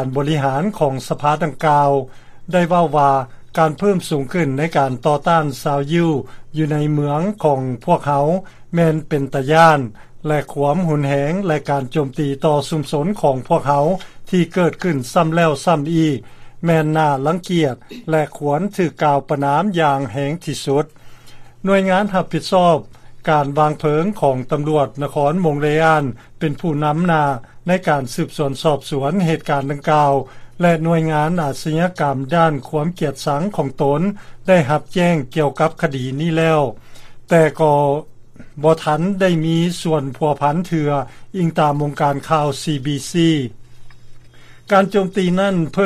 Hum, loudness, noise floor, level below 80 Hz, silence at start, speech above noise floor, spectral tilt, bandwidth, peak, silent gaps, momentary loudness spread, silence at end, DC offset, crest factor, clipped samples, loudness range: none; -17 LUFS; -40 dBFS; -46 dBFS; 0 s; 23 dB; -6.5 dB/octave; 14.5 kHz; 0 dBFS; none; 7 LU; 0 s; under 0.1%; 18 dB; under 0.1%; 2 LU